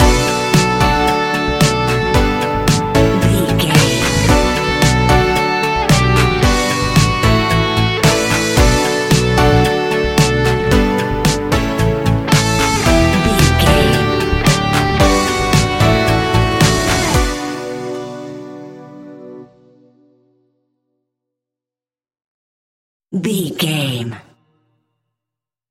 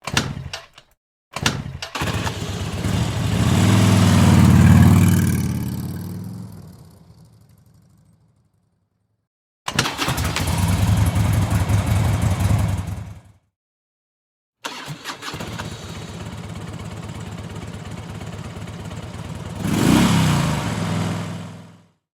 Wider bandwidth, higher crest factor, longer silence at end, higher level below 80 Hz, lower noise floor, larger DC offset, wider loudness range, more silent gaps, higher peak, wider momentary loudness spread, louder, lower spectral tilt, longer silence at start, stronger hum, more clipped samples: about the same, 17 kHz vs 16.5 kHz; second, 14 dB vs 20 dB; first, 1.5 s vs 0.45 s; first, -24 dBFS vs -36 dBFS; first, under -90 dBFS vs -69 dBFS; neither; second, 10 LU vs 17 LU; second, 22.26-23.00 s vs 0.97-1.31 s, 9.27-9.66 s, 13.56-14.53 s; about the same, 0 dBFS vs 0 dBFS; second, 8 LU vs 19 LU; first, -13 LUFS vs -19 LUFS; about the same, -4.5 dB/octave vs -5.5 dB/octave; about the same, 0 s vs 0.05 s; neither; neither